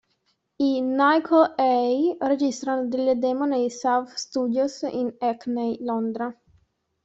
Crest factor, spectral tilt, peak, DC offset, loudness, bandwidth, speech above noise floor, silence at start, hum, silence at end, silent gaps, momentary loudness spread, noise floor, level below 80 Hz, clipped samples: 18 dB; -4.5 dB/octave; -6 dBFS; under 0.1%; -23 LUFS; 8 kHz; 48 dB; 0.6 s; none; 0.7 s; none; 8 LU; -71 dBFS; -70 dBFS; under 0.1%